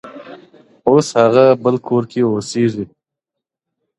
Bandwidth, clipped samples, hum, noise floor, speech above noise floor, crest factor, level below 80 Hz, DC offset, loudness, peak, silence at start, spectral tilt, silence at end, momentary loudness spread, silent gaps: 11.5 kHz; under 0.1%; none; -82 dBFS; 69 dB; 16 dB; -58 dBFS; under 0.1%; -14 LUFS; 0 dBFS; 0.05 s; -6.5 dB/octave; 1.15 s; 14 LU; none